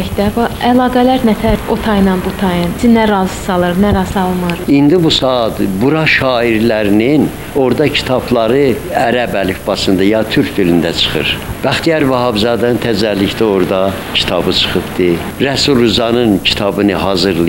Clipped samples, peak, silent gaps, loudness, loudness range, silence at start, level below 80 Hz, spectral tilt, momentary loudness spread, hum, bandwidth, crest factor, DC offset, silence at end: under 0.1%; 0 dBFS; none; -12 LUFS; 1 LU; 0 s; -32 dBFS; -5.5 dB/octave; 5 LU; none; 16.5 kHz; 12 dB; 0.3%; 0 s